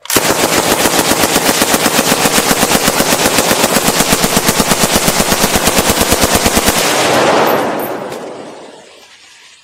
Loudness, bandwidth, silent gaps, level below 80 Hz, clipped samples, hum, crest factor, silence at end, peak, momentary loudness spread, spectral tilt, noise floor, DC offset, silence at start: -10 LUFS; over 20 kHz; none; -32 dBFS; 0.3%; none; 12 dB; 0.8 s; 0 dBFS; 6 LU; -2.5 dB/octave; -40 dBFS; under 0.1%; 0.1 s